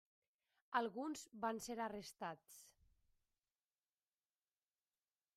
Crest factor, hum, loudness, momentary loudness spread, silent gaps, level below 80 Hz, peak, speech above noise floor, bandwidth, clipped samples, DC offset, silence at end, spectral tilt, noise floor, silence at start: 26 dB; none; -46 LUFS; 15 LU; none; -84 dBFS; -24 dBFS; over 43 dB; 15.5 kHz; under 0.1%; under 0.1%; 2.65 s; -3.5 dB/octave; under -90 dBFS; 0.7 s